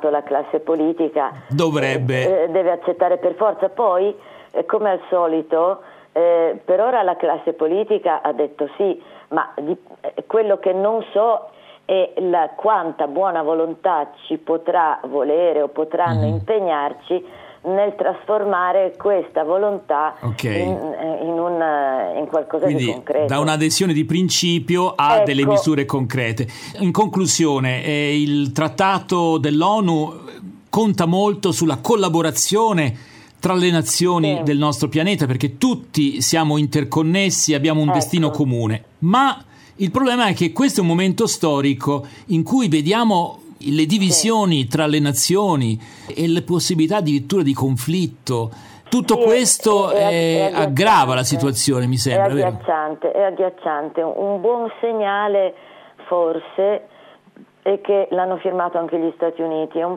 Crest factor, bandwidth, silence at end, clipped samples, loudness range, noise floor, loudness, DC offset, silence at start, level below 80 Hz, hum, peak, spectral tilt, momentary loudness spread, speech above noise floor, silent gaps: 16 dB; 17 kHz; 0 s; under 0.1%; 4 LU; -48 dBFS; -18 LUFS; under 0.1%; 0 s; -60 dBFS; none; -2 dBFS; -5 dB/octave; 7 LU; 30 dB; none